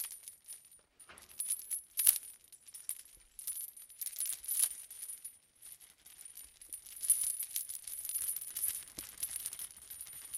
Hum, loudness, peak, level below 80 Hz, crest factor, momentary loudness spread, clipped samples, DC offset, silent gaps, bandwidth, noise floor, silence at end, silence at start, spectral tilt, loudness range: none; -36 LUFS; -6 dBFS; -76 dBFS; 34 dB; 22 LU; under 0.1%; under 0.1%; none; 18 kHz; -61 dBFS; 0 s; 0 s; 2.5 dB/octave; 4 LU